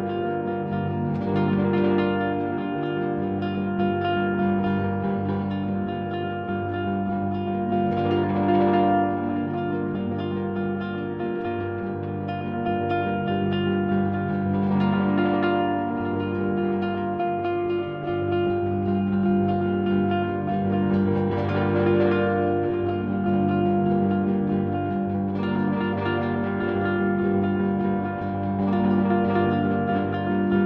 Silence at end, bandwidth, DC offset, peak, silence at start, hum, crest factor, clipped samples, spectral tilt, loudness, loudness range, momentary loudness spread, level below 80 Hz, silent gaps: 0 s; 5.2 kHz; under 0.1%; -10 dBFS; 0 s; none; 14 dB; under 0.1%; -10.5 dB/octave; -24 LUFS; 3 LU; 6 LU; -54 dBFS; none